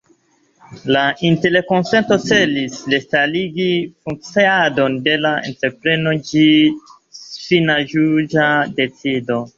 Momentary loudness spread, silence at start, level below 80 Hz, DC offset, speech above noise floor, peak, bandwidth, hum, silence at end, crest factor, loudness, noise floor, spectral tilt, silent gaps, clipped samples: 8 LU; 0.7 s; -56 dBFS; under 0.1%; 42 dB; -2 dBFS; 7.6 kHz; none; 0.1 s; 16 dB; -16 LUFS; -57 dBFS; -5.5 dB/octave; none; under 0.1%